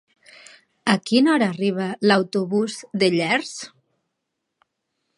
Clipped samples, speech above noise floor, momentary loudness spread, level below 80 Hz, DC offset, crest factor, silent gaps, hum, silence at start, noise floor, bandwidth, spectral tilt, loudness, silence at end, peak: under 0.1%; 59 dB; 9 LU; -72 dBFS; under 0.1%; 22 dB; none; none; 0.85 s; -79 dBFS; 11.5 kHz; -5 dB/octave; -21 LUFS; 1.5 s; -2 dBFS